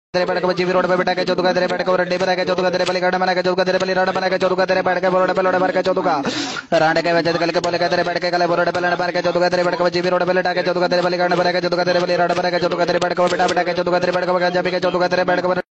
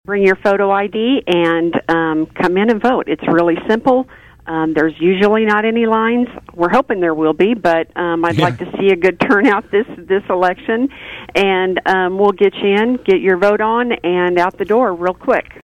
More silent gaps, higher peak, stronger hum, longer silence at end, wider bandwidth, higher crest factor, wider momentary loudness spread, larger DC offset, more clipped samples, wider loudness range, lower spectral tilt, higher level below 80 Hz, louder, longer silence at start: neither; about the same, -4 dBFS vs -2 dBFS; neither; second, 0.1 s vs 0.25 s; second, 8.4 kHz vs 9.8 kHz; about the same, 14 dB vs 14 dB; second, 2 LU vs 6 LU; neither; neither; about the same, 1 LU vs 1 LU; second, -5 dB/octave vs -7 dB/octave; second, -56 dBFS vs -48 dBFS; second, -18 LUFS vs -15 LUFS; about the same, 0.15 s vs 0.1 s